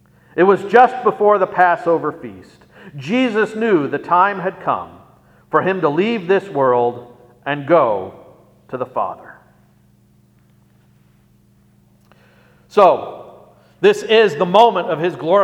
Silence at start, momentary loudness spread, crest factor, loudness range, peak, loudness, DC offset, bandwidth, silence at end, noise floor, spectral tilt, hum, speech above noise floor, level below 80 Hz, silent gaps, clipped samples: 0.35 s; 19 LU; 18 dB; 13 LU; 0 dBFS; -16 LUFS; under 0.1%; 11.5 kHz; 0 s; -53 dBFS; -6 dB/octave; 60 Hz at -50 dBFS; 38 dB; -62 dBFS; none; under 0.1%